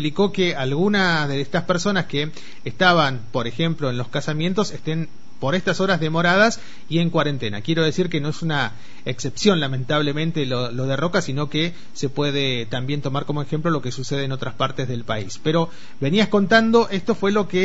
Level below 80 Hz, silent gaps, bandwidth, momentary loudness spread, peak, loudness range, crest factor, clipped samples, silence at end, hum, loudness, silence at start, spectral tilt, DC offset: -54 dBFS; none; 8 kHz; 10 LU; -2 dBFS; 4 LU; 20 dB; under 0.1%; 0 s; none; -21 LUFS; 0 s; -5.5 dB/octave; 4%